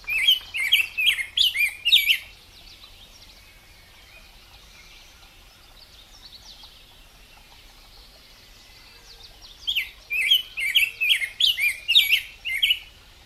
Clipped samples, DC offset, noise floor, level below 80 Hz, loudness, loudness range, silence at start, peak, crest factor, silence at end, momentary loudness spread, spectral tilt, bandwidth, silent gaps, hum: under 0.1%; under 0.1%; -50 dBFS; -54 dBFS; -20 LUFS; 12 LU; 0.05 s; -6 dBFS; 22 dB; 0.4 s; 9 LU; 2.5 dB/octave; 16 kHz; none; none